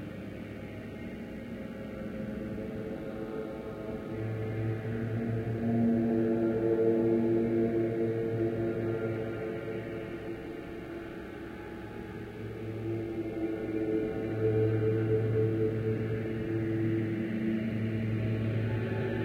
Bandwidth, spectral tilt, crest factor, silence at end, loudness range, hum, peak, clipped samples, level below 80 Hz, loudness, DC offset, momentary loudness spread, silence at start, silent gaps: 6.8 kHz; -9.5 dB/octave; 16 dB; 0 s; 10 LU; none; -16 dBFS; under 0.1%; -54 dBFS; -33 LUFS; under 0.1%; 13 LU; 0 s; none